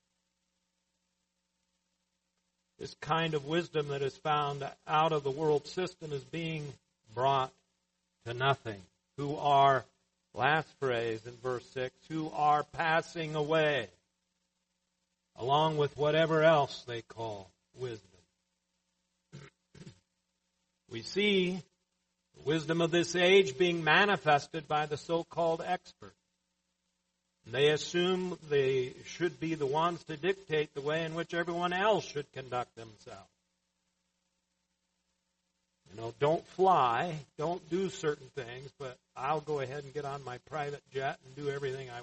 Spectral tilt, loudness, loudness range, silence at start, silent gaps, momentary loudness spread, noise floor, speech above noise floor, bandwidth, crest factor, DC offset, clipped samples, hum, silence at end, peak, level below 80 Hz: -5 dB/octave; -32 LUFS; 10 LU; 2.8 s; none; 17 LU; -82 dBFS; 50 dB; 8.4 kHz; 22 dB; under 0.1%; under 0.1%; none; 0 s; -12 dBFS; -70 dBFS